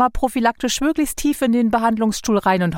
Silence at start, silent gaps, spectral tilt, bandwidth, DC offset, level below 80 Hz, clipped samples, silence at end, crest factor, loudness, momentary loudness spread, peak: 0 s; none; -4.5 dB/octave; 17 kHz; under 0.1%; -36 dBFS; under 0.1%; 0 s; 14 dB; -19 LUFS; 3 LU; -4 dBFS